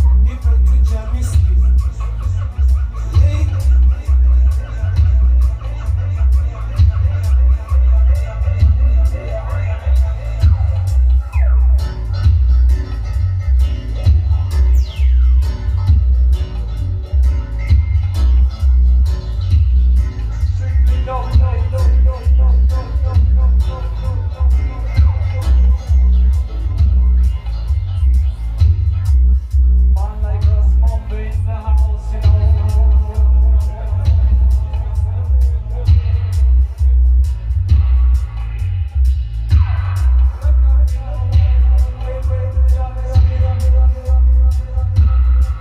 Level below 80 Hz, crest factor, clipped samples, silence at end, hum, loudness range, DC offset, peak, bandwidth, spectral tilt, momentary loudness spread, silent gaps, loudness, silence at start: -14 dBFS; 10 dB; under 0.1%; 0 s; none; 1 LU; under 0.1%; -2 dBFS; 5.8 kHz; -8 dB/octave; 7 LU; none; -16 LUFS; 0 s